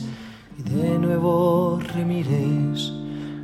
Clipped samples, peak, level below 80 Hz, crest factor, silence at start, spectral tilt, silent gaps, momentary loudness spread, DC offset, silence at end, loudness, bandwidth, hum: under 0.1%; -8 dBFS; -54 dBFS; 14 dB; 0 s; -7.5 dB/octave; none; 15 LU; under 0.1%; 0 s; -22 LUFS; 13.5 kHz; none